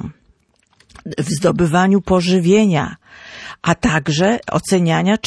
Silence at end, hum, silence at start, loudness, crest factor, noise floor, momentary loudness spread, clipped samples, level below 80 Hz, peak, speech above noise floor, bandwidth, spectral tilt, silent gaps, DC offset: 0 s; none; 0 s; -16 LUFS; 14 dB; -58 dBFS; 20 LU; under 0.1%; -42 dBFS; -2 dBFS; 43 dB; 11 kHz; -5.5 dB/octave; none; under 0.1%